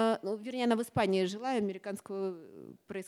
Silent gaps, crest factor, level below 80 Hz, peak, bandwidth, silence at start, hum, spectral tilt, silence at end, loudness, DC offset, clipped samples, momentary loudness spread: none; 18 dB; -74 dBFS; -16 dBFS; 15 kHz; 0 s; none; -5.5 dB/octave; 0 s; -33 LUFS; under 0.1%; under 0.1%; 15 LU